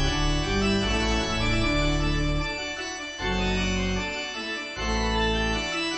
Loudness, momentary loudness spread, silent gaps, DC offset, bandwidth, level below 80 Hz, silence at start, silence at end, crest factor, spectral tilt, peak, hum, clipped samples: -26 LUFS; 6 LU; none; 0.2%; 8.4 kHz; -32 dBFS; 0 s; 0 s; 14 dB; -4.5 dB/octave; -12 dBFS; none; under 0.1%